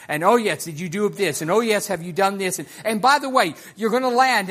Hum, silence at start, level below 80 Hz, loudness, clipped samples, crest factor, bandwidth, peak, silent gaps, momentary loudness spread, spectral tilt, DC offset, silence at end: none; 0 s; -68 dBFS; -20 LUFS; under 0.1%; 18 dB; 15.5 kHz; -2 dBFS; none; 8 LU; -3.5 dB/octave; under 0.1%; 0 s